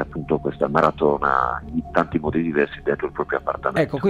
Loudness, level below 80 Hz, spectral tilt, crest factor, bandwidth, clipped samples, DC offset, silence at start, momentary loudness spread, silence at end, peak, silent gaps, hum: -22 LUFS; -42 dBFS; -8 dB/octave; 18 dB; 12 kHz; under 0.1%; under 0.1%; 0 s; 6 LU; 0 s; -2 dBFS; none; none